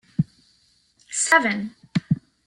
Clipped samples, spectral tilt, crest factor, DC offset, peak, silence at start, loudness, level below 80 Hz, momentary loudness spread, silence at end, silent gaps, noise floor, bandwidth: under 0.1%; -4 dB/octave; 22 dB; under 0.1%; -2 dBFS; 0.2 s; -22 LUFS; -60 dBFS; 12 LU; 0.3 s; none; -62 dBFS; 12.5 kHz